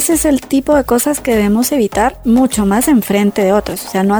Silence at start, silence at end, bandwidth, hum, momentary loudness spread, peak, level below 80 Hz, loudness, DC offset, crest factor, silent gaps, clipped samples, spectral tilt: 0 s; 0 s; over 20 kHz; none; 3 LU; -2 dBFS; -34 dBFS; -13 LUFS; under 0.1%; 12 dB; none; under 0.1%; -4.5 dB/octave